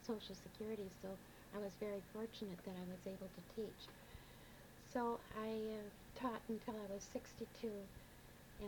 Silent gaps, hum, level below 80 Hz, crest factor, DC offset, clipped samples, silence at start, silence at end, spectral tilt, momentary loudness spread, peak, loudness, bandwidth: none; none; -68 dBFS; 20 dB; under 0.1%; under 0.1%; 0 s; 0 s; -5.5 dB/octave; 14 LU; -30 dBFS; -49 LUFS; 19 kHz